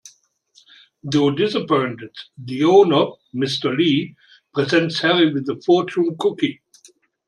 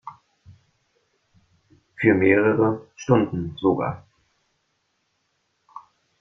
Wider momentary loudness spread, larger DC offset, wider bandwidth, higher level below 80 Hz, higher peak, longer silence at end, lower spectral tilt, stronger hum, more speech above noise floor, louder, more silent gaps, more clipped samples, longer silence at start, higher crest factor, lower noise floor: about the same, 14 LU vs 14 LU; neither; first, 10.5 kHz vs 6.6 kHz; second, -66 dBFS vs -60 dBFS; about the same, -2 dBFS vs -2 dBFS; first, 0.75 s vs 0.4 s; second, -6 dB/octave vs -7.5 dB/octave; neither; second, 38 dB vs 52 dB; about the same, -19 LUFS vs -21 LUFS; neither; neither; first, 1.05 s vs 0.05 s; about the same, 18 dB vs 22 dB; second, -57 dBFS vs -72 dBFS